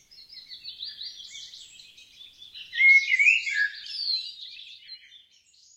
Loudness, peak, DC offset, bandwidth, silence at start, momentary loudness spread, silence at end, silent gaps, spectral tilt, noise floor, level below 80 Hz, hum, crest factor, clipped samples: -20 LUFS; -8 dBFS; under 0.1%; 11 kHz; 0.2 s; 27 LU; 0.8 s; none; 4 dB/octave; -59 dBFS; -76 dBFS; none; 20 dB; under 0.1%